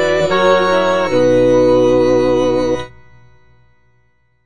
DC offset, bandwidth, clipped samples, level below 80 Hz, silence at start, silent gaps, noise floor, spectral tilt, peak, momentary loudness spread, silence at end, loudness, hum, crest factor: under 0.1%; 9.4 kHz; under 0.1%; -42 dBFS; 0 s; none; -60 dBFS; -5.5 dB/octave; 0 dBFS; 6 LU; 0 s; -13 LUFS; 60 Hz at -50 dBFS; 14 dB